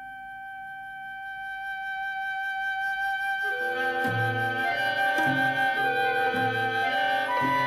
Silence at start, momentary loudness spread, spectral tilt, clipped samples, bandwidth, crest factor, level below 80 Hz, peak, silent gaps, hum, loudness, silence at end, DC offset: 0 s; 14 LU; -4.5 dB/octave; under 0.1%; 16 kHz; 12 dB; -64 dBFS; -14 dBFS; none; 50 Hz at -65 dBFS; -26 LUFS; 0 s; under 0.1%